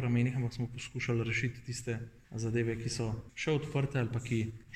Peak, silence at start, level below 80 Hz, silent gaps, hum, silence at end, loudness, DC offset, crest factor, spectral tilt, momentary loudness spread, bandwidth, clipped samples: -20 dBFS; 0 s; -56 dBFS; none; none; 0 s; -35 LUFS; under 0.1%; 14 dB; -6 dB/octave; 7 LU; 11.5 kHz; under 0.1%